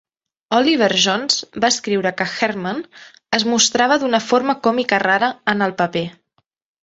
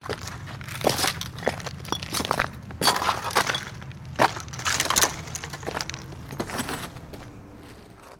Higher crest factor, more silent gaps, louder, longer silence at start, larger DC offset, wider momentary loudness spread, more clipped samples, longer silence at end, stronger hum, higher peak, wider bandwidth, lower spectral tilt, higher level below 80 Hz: second, 18 dB vs 26 dB; neither; first, -17 LUFS vs -26 LUFS; first, 0.5 s vs 0 s; neither; second, 7 LU vs 20 LU; neither; first, 0.7 s vs 0 s; neither; about the same, 0 dBFS vs -2 dBFS; second, 8 kHz vs 17.5 kHz; about the same, -2.5 dB/octave vs -2.5 dB/octave; second, -62 dBFS vs -48 dBFS